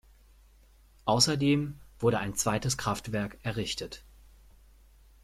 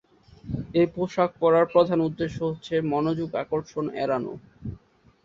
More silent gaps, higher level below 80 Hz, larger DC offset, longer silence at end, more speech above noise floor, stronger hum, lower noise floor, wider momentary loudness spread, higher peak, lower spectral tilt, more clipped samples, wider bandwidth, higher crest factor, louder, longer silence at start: neither; about the same, -54 dBFS vs -52 dBFS; neither; first, 1.25 s vs 0.45 s; about the same, 30 dB vs 32 dB; neither; about the same, -59 dBFS vs -56 dBFS; second, 12 LU vs 15 LU; second, -10 dBFS vs -6 dBFS; second, -4 dB/octave vs -7.5 dB/octave; neither; first, 16 kHz vs 7.4 kHz; about the same, 22 dB vs 20 dB; second, -29 LUFS vs -25 LUFS; first, 1.05 s vs 0.45 s